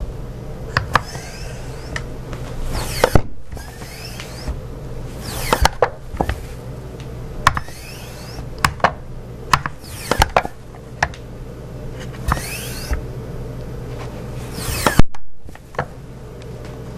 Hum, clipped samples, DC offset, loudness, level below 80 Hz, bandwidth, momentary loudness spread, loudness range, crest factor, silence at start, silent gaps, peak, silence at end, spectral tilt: none; 0.1%; under 0.1%; -23 LUFS; -30 dBFS; 15.5 kHz; 17 LU; 5 LU; 22 dB; 0 s; none; 0 dBFS; 0 s; -4.5 dB/octave